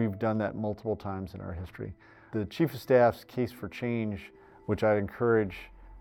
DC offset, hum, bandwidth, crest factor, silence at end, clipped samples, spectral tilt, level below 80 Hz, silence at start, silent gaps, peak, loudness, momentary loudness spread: under 0.1%; none; 18.5 kHz; 20 dB; 0 s; under 0.1%; -8 dB/octave; -56 dBFS; 0 s; none; -10 dBFS; -30 LUFS; 17 LU